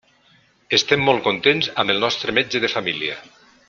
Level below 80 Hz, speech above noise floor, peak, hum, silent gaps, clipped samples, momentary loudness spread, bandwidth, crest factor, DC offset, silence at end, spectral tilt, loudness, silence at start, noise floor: -60 dBFS; 37 dB; -2 dBFS; none; none; under 0.1%; 7 LU; 7.4 kHz; 20 dB; under 0.1%; 0.45 s; -3.5 dB/octave; -19 LUFS; 0.7 s; -57 dBFS